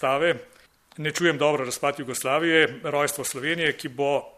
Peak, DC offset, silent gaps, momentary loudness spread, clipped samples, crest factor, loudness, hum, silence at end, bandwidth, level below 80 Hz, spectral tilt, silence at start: -6 dBFS; under 0.1%; none; 8 LU; under 0.1%; 20 dB; -24 LUFS; none; 0.05 s; 15 kHz; -66 dBFS; -3.5 dB/octave; 0 s